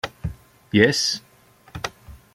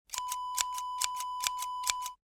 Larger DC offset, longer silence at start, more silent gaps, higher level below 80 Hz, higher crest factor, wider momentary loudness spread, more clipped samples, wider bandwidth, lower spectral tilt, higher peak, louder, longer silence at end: neither; about the same, 0.05 s vs 0.1 s; neither; first, -46 dBFS vs -68 dBFS; about the same, 22 dB vs 26 dB; first, 17 LU vs 3 LU; neither; second, 16 kHz vs over 20 kHz; first, -4 dB/octave vs 3.5 dB/octave; first, -2 dBFS vs -8 dBFS; first, -22 LUFS vs -34 LUFS; about the same, 0.2 s vs 0.15 s